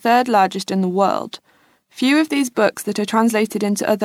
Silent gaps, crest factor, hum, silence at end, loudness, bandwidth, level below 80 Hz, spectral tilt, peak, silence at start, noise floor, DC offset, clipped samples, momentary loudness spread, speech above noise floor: none; 14 dB; none; 0 s; -18 LUFS; 16.5 kHz; -70 dBFS; -4.5 dB/octave; -4 dBFS; 0.05 s; -57 dBFS; under 0.1%; under 0.1%; 7 LU; 39 dB